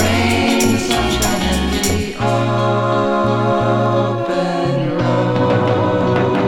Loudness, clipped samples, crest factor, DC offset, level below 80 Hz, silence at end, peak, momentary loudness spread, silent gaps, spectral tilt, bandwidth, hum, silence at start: -16 LUFS; under 0.1%; 14 dB; under 0.1%; -32 dBFS; 0 s; -2 dBFS; 3 LU; none; -5 dB/octave; 19 kHz; none; 0 s